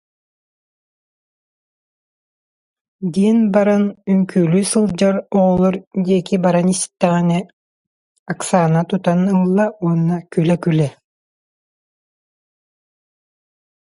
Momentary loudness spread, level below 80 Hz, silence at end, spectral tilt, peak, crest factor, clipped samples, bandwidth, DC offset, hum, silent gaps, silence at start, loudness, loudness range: 5 LU; -54 dBFS; 2.95 s; -6.5 dB/octave; 0 dBFS; 18 dB; under 0.1%; 11.5 kHz; under 0.1%; none; 5.87-5.91 s, 7.53-8.26 s; 3 s; -16 LUFS; 7 LU